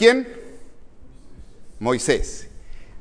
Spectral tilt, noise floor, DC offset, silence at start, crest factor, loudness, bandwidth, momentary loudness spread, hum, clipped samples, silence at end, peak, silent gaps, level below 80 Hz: -3.5 dB/octave; -41 dBFS; under 0.1%; 0 s; 22 dB; -22 LUFS; 10.5 kHz; 25 LU; none; under 0.1%; 0 s; 0 dBFS; none; -38 dBFS